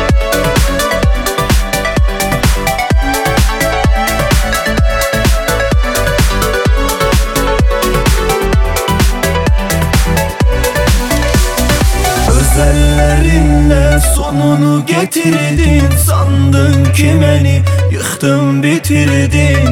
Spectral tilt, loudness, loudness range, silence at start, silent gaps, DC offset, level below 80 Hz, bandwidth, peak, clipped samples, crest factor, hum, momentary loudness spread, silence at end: -5 dB/octave; -11 LUFS; 2 LU; 0 s; none; under 0.1%; -14 dBFS; 17.5 kHz; 0 dBFS; under 0.1%; 10 dB; none; 3 LU; 0 s